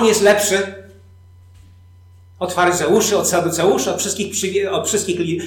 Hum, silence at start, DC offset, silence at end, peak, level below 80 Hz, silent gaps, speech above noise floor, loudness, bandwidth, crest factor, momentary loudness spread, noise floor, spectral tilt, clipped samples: none; 0 s; under 0.1%; 0 s; -4 dBFS; -56 dBFS; none; 28 dB; -17 LUFS; 19 kHz; 14 dB; 7 LU; -45 dBFS; -3 dB/octave; under 0.1%